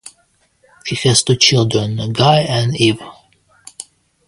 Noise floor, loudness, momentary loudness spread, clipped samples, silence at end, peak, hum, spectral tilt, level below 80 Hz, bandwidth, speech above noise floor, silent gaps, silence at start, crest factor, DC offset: -59 dBFS; -14 LUFS; 22 LU; under 0.1%; 0.45 s; 0 dBFS; none; -4 dB/octave; -48 dBFS; 11.5 kHz; 45 dB; none; 0.05 s; 16 dB; under 0.1%